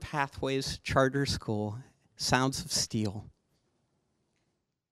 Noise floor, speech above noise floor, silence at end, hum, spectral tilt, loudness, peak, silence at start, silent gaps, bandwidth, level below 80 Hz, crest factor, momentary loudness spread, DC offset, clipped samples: -80 dBFS; 49 dB; 1.65 s; none; -4 dB/octave; -31 LUFS; -8 dBFS; 0 s; none; 16 kHz; -54 dBFS; 24 dB; 9 LU; under 0.1%; under 0.1%